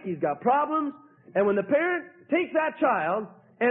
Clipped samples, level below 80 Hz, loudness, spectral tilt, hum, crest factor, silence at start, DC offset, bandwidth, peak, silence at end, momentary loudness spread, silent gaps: under 0.1%; -72 dBFS; -26 LUFS; -10.5 dB/octave; none; 14 dB; 0 s; under 0.1%; 3.9 kHz; -12 dBFS; 0 s; 8 LU; none